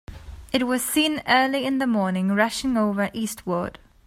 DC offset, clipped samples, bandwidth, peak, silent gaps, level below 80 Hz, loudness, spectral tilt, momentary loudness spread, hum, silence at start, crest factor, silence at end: under 0.1%; under 0.1%; 16 kHz; -4 dBFS; none; -48 dBFS; -23 LUFS; -4 dB/octave; 9 LU; none; 0.1 s; 20 dB; 0.35 s